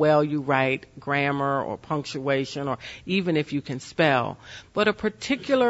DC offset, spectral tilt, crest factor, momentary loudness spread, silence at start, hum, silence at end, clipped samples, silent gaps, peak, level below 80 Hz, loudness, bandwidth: under 0.1%; -6 dB/octave; 18 dB; 9 LU; 0 s; none; 0 s; under 0.1%; none; -6 dBFS; -58 dBFS; -25 LUFS; 8 kHz